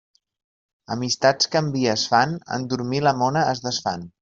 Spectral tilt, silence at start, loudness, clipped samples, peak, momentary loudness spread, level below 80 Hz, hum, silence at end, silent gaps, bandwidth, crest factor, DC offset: -4 dB/octave; 0.9 s; -22 LUFS; under 0.1%; -4 dBFS; 9 LU; -60 dBFS; none; 0.15 s; none; 8 kHz; 20 dB; under 0.1%